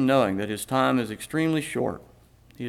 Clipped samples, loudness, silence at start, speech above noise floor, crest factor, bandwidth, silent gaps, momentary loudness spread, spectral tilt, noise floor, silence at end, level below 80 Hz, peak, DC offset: under 0.1%; -25 LUFS; 0 s; 21 dB; 18 dB; 16 kHz; none; 7 LU; -5.5 dB/octave; -46 dBFS; 0 s; -58 dBFS; -8 dBFS; under 0.1%